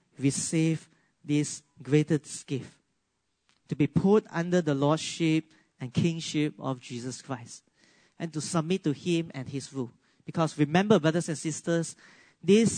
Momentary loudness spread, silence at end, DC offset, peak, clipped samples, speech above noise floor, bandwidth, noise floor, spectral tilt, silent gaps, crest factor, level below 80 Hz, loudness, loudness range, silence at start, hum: 14 LU; 0 s; under 0.1%; -8 dBFS; under 0.1%; 50 dB; 9.6 kHz; -78 dBFS; -5.5 dB/octave; none; 20 dB; -68 dBFS; -28 LUFS; 6 LU; 0.2 s; none